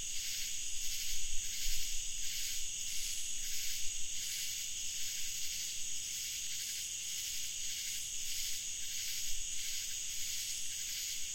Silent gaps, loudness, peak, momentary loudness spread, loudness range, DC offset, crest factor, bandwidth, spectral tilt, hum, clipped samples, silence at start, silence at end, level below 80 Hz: none; -37 LUFS; -22 dBFS; 1 LU; 0 LU; 0.3%; 16 dB; 16.5 kHz; 2 dB/octave; none; under 0.1%; 0 s; 0 s; -50 dBFS